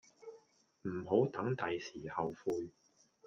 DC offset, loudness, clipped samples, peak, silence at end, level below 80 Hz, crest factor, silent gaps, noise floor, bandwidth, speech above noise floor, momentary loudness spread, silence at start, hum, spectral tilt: under 0.1%; -38 LUFS; under 0.1%; -18 dBFS; 0.55 s; -74 dBFS; 20 dB; none; -67 dBFS; 7.6 kHz; 30 dB; 20 LU; 0.2 s; none; -7 dB/octave